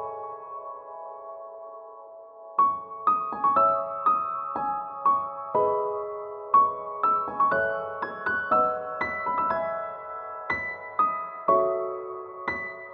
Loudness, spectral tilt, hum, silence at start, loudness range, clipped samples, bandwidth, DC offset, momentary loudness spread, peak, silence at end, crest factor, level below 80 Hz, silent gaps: -26 LUFS; -7.5 dB/octave; none; 0 s; 3 LU; under 0.1%; 5.4 kHz; under 0.1%; 17 LU; -10 dBFS; 0 s; 18 dB; -66 dBFS; none